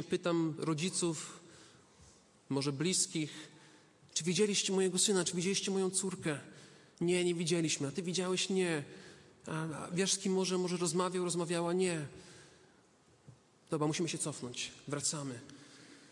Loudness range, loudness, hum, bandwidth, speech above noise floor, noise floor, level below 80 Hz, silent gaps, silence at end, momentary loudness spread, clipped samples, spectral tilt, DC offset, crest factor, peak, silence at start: 6 LU; -34 LUFS; none; 11.5 kHz; 32 dB; -66 dBFS; -78 dBFS; none; 0.05 s; 17 LU; under 0.1%; -4 dB/octave; under 0.1%; 18 dB; -18 dBFS; 0 s